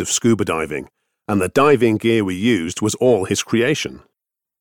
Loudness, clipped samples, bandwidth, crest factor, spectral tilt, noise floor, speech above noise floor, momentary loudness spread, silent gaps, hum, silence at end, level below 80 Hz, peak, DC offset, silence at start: -18 LUFS; under 0.1%; 18.5 kHz; 16 dB; -4.5 dB/octave; -82 dBFS; 65 dB; 10 LU; none; none; 0.6 s; -52 dBFS; -2 dBFS; under 0.1%; 0 s